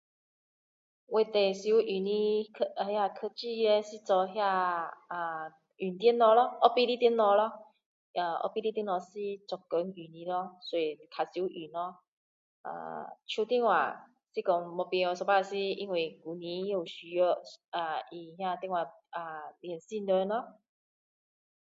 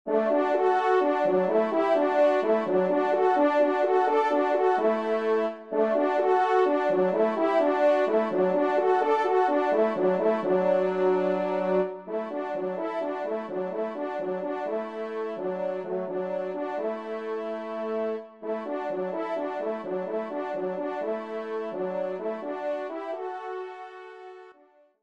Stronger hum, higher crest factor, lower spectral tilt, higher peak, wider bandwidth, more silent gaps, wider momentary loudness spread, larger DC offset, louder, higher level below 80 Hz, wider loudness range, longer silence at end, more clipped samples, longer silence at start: neither; first, 24 dB vs 14 dB; second, -5 dB/octave vs -7 dB/octave; first, -8 dBFS vs -12 dBFS; about the same, 7.8 kHz vs 7.8 kHz; first, 7.86-8.14 s, 12.08-12.64 s, 17.68-17.72 s vs none; first, 15 LU vs 10 LU; neither; second, -31 LUFS vs -26 LUFS; second, -86 dBFS vs -78 dBFS; about the same, 8 LU vs 8 LU; first, 1.1 s vs 0.5 s; neither; first, 1.1 s vs 0.05 s